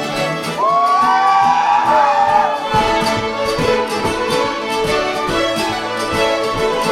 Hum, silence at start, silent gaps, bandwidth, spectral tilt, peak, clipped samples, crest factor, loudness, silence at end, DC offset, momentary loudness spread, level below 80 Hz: none; 0 s; none; 16 kHz; -4 dB/octave; -2 dBFS; under 0.1%; 14 dB; -15 LUFS; 0 s; under 0.1%; 6 LU; -40 dBFS